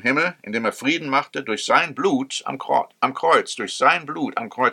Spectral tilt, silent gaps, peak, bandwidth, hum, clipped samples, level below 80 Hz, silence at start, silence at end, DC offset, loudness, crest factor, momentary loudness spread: -3.5 dB/octave; none; -2 dBFS; 15.5 kHz; none; under 0.1%; -76 dBFS; 0.05 s; 0 s; under 0.1%; -21 LUFS; 20 dB; 9 LU